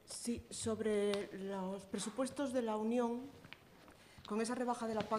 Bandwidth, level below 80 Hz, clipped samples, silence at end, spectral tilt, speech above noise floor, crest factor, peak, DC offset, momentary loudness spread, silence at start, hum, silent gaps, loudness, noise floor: 14.5 kHz; -70 dBFS; under 0.1%; 0 s; -4.5 dB/octave; 23 dB; 20 dB; -20 dBFS; under 0.1%; 18 LU; 0.05 s; none; none; -40 LUFS; -62 dBFS